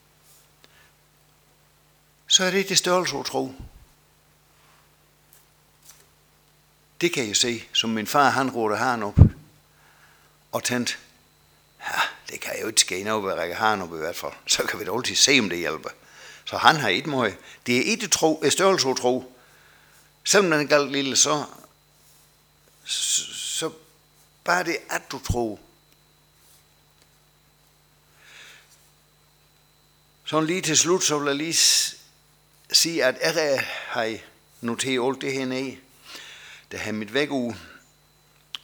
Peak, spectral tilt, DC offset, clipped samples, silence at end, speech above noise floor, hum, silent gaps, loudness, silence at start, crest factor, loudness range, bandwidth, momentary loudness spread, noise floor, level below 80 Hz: 0 dBFS; -3 dB/octave; under 0.1%; under 0.1%; 0.05 s; 36 dB; 50 Hz at -55 dBFS; none; -22 LUFS; 2.3 s; 26 dB; 9 LU; over 20 kHz; 16 LU; -60 dBFS; -44 dBFS